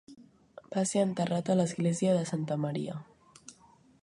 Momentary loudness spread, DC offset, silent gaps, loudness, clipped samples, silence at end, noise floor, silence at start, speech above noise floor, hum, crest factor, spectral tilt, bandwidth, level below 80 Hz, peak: 13 LU; under 0.1%; none; -30 LUFS; under 0.1%; 0.5 s; -61 dBFS; 0.1 s; 32 dB; none; 16 dB; -6 dB/octave; 11.5 kHz; -72 dBFS; -14 dBFS